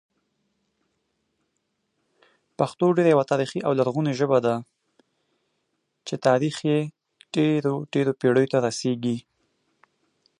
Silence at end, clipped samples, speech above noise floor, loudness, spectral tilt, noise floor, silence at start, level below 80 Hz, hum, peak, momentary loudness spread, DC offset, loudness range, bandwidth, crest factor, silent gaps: 1.2 s; under 0.1%; 54 dB; -23 LUFS; -6.5 dB/octave; -76 dBFS; 2.6 s; -72 dBFS; none; -6 dBFS; 9 LU; under 0.1%; 3 LU; 11.5 kHz; 20 dB; none